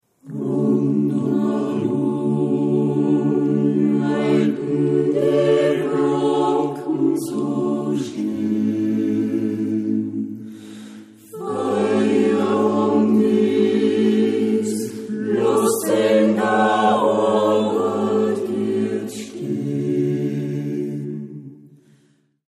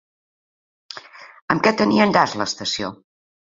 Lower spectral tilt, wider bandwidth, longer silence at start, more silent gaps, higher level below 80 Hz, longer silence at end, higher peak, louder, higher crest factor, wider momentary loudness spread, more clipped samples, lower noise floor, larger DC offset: first, -6.5 dB/octave vs -4.5 dB/octave; first, 14.5 kHz vs 7.8 kHz; second, 0.25 s vs 0.9 s; second, none vs 1.42-1.48 s; second, -70 dBFS vs -58 dBFS; first, 0.95 s vs 0.55 s; second, -6 dBFS vs -2 dBFS; about the same, -19 LUFS vs -19 LUFS; second, 14 dB vs 20 dB; second, 10 LU vs 22 LU; neither; first, -60 dBFS vs -41 dBFS; neither